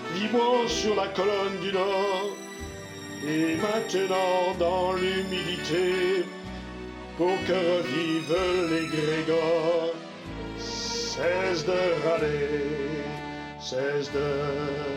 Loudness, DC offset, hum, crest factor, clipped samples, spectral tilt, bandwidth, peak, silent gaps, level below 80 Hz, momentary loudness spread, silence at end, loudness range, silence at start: -27 LUFS; under 0.1%; none; 14 dB; under 0.1%; -4.5 dB/octave; 16 kHz; -12 dBFS; none; -52 dBFS; 13 LU; 0 s; 2 LU; 0 s